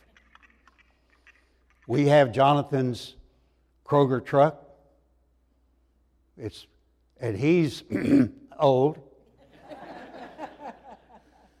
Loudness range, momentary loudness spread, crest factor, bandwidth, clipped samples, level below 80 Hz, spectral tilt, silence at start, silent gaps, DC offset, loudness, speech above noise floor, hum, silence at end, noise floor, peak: 7 LU; 23 LU; 20 dB; 12.5 kHz; under 0.1%; -62 dBFS; -7.5 dB/octave; 1.9 s; none; under 0.1%; -23 LUFS; 43 dB; none; 0.65 s; -66 dBFS; -6 dBFS